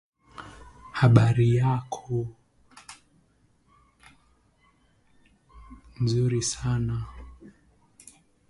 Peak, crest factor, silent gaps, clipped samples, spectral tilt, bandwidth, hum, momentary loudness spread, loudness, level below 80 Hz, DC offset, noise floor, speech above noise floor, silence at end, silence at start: -2 dBFS; 26 dB; none; under 0.1%; -6 dB/octave; 11.5 kHz; none; 28 LU; -25 LUFS; -50 dBFS; under 0.1%; -64 dBFS; 42 dB; 1 s; 0.4 s